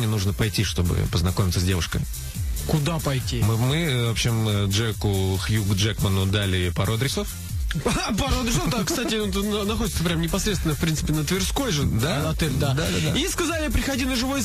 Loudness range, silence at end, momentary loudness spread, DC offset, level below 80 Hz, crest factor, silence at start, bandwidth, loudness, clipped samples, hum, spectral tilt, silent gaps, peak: 1 LU; 0 s; 3 LU; under 0.1%; -32 dBFS; 12 dB; 0 s; 15.5 kHz; -23 LUFS; under 0.1%; none; -4.5 dB/octave; none; -10 dBFS